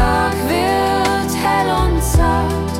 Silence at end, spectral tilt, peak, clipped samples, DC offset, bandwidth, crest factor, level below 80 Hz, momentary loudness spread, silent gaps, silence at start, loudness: 0 s; -5 dB/octave; -2 dBFS; under 0.1%; under 0.1%; 16.5 kHz; 14 dB; -24 dBFS; 2 LU; none; 0 s; -16 LUFS